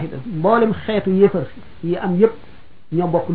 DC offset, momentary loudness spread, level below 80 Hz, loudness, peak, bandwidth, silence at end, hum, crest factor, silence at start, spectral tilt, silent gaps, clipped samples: 2%; 11 LU; -48 dBFS; -18 LUFS; -2 dBFS; 4.7 kHz; 0 s; none; 16 dB; 0 s; -11.5 dB/octave; none; under 0.1%